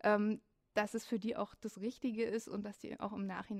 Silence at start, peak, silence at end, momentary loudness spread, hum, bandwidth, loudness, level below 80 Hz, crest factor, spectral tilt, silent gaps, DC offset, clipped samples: 0.05 s; -18 dBFS; 0 s; 9 LU; none; 14.5 kHz; -40 LUFS; -74 dBFS; 20 dB; -6 dB/octave; none; under 0.1%; under 0.1%